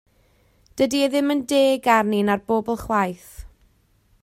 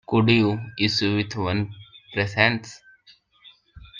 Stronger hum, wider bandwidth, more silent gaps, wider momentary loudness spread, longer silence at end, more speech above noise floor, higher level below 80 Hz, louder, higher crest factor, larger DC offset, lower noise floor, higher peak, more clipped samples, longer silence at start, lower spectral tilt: neither; first, 16 kHz vs 7.6 kHz; neither; second, 7 LU vs 13 LU; first, 0.75 s vs 0 s; first, 40 dB vs 34 dB; first, -50 dBFS vs -56 dBFS; about the same, -20 LUFS vs -22 LUFS; about the same, 20 dB vs 22 dB; neither; first, -61 dBFS vs -56 dBFS; about the same, -2 dBFS vs -2 dBFS; neither; first, 0.75 s vs 0.1 s; second, -4.5 dB/octave vs -6 dB/octave